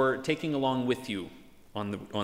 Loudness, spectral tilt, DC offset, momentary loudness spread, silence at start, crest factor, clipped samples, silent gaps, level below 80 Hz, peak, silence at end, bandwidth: -31 LUFS; -6 dB/octave; under 0.1%; 11 LU; 0 s; 16 dB; under 0.1%; none; -64 dBFS; -14 dBFS; 0 s; 16 kHz